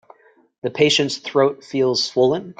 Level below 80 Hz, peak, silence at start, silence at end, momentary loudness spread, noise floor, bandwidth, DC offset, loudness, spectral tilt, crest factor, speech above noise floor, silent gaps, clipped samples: -62 dBFS; -2 dBFS; 0.65 s; 0.1 s; 7 LU; -51 dBFS; 9.2 kHz; under 0.1%; -19 LUFS; -4 dB/octave; 18 dB; 32 dB; none; under 0.1%